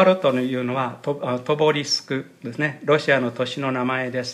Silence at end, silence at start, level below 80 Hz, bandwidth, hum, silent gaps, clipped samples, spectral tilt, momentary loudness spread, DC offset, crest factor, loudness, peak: 0 s; 0 s; -74 dBFS; 13.5 kHz; none; none; under 0.1%; -5 dB/octave; 8 LU; under 0.1%; 18 dB; -22 LUFS; -4 dBFS